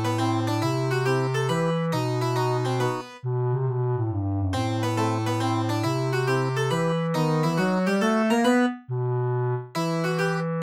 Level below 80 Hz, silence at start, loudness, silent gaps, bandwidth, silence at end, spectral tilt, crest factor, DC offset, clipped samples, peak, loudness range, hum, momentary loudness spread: -68 dBFS; 0 s; -25 LUFS; none; 15.5 kHz; 0 s; -6.5 dB/octave; 14 dB; under 0.1%; under 0.1%; -10 dBFS; 3 LU; none; 5 LU